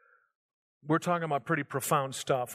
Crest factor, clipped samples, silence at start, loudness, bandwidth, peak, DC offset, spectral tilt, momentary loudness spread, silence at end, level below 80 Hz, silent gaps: 18 dB; under 0.1%; 0.85 s; -30 LUFS; 15.5 kHz; -14 dBFS; under 0.1%; -5 dB/octave; 3 LU; 0 s; -76 dBFS; none